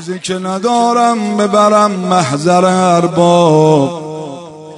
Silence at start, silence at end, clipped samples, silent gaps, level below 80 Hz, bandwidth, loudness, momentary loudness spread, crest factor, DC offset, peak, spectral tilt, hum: 0 s; 0 s; 0.2%; none; -58 dBFS; 11 kHz; -11 LUFS; 14 LU; 12 dB; under 0.1%; 0 dBFS; -5.5 dB/octave; none